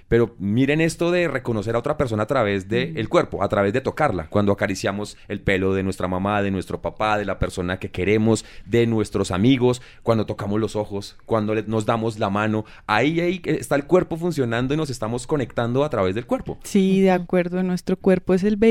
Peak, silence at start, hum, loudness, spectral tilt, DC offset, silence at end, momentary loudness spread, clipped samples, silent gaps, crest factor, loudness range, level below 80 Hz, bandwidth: -4 dBFS; 0.1 s; none; -22 LUFS; -6.5 dB/octave; under 0.1%; 0 s; 7 LU; under 0.1%; none; 18 dB; 2 LU; -44 dBFS; 15.5 kHz